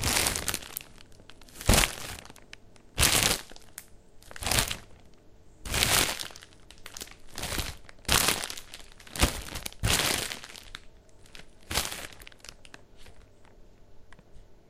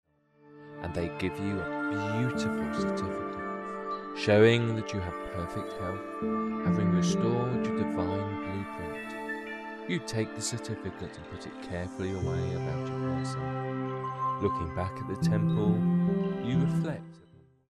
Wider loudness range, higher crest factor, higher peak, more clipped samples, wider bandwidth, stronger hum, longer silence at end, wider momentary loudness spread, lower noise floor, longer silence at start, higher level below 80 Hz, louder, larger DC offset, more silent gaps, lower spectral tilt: first, 11 LU vs 6 LU; first, 30 dB vs 22 dB; first, 0 dBFS vs -10 dBFS; neither; first, 16 kHz vs 12 kHz; neither; second, 0.15 s vs 0.5 s; first, 24 LU vs 11 LU; second, -54 dBFS vs -59 dBFS; second, 0 s vs 0.45 s; first, -40 dBFS vs -56 dBFS; first, -27 LUFS vs -31 LUFS; first, 0.1% vs under 0.1%; neither; second, -2 dB/octave vs -6.5 dB/octave